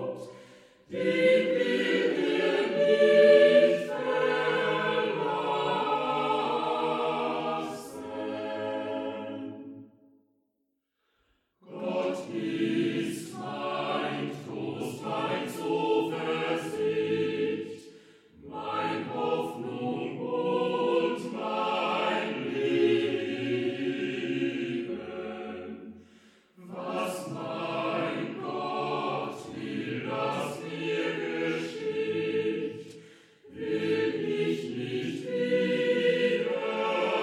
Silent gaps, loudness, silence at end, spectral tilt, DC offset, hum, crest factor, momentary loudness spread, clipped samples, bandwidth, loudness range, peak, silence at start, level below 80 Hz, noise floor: none; -29 LUFS; 0 s; -5.5 dB/octave; under 0.1%; none; 20 dB; 12 LU; under 0.1%; 14.5 kHz; 12 LU; -8 dBFS; 0 s; -76 dBFS; -79 dBFS